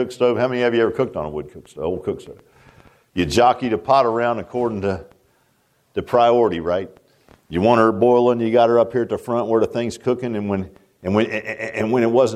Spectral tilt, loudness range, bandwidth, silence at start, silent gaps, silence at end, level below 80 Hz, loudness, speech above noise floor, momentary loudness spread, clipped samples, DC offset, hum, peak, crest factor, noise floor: -6.5 dB/octave; 4 LU; 13 kHz; 0 s; none; 0 s; -50 dBFS; -19 LUFS; 44 dB; 14 LU; under 0.1%; under 0.1%; none; -2 dBFS; 18 dB; -62 dBFS